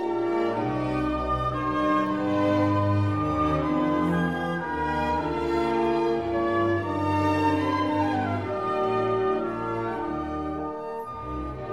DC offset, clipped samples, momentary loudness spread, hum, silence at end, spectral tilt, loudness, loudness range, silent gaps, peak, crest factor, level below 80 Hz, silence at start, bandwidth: 0.2%; under 0.1%; 7 LU; none; 0 s; -8 dB/octave; -26 LUFS; 3 LU; none; -12 dBFS; 12 dB; -44 dBFS; 0 s; 11.5 kHz